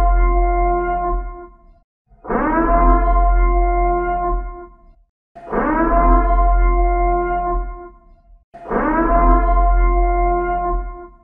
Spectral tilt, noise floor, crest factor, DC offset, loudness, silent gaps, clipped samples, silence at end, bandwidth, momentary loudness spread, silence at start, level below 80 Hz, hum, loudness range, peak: -12 dB/octave; -46 dBFS; 14 dB; under 0.1%; -18 LUFS; 1.84-2.05 s, 5.09-5.35 s, 8.44-8.52 s; under 0.1%; 0.15 s; 2.8 kHz; 12 LU; 0 s; -18 dBFS; none; 1 LU; -2 dBFS